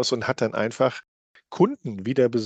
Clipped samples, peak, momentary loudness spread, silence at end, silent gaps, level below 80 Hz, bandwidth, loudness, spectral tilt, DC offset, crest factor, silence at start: under 0.1%; -6 dBFS; 10 LU; 0 s; 1.08-1.34 s; -68 dBFS; 9 kHz; -24 LUFS; -5.5 dB/octave; under 0.1%; 18 dB; 0 s